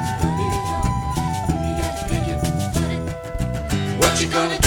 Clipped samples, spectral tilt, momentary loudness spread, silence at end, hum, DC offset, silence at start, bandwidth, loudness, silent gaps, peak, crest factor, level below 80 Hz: under 0.1%; -4.5 dB/octave; 8 LU; 0 s; none; under 0.1%; 0 s; over 20 kHz; -22 LUFS; none; -2 dBFS; 20 dB; -30 dBFS